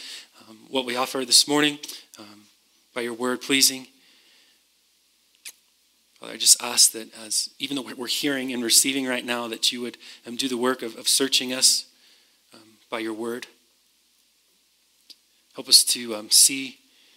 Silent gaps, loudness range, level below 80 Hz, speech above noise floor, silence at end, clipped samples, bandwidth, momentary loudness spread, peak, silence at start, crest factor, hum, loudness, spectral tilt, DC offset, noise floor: none; 6 LU; -84 dBFS; 41 dB; 0.45 s; under 0.1%; 16 kHz; 22 LU; 0 dBFS; 0 s; 24 dB; none; -20 LUFS; 0 dB/octave; under 0.1%; -64 dBFS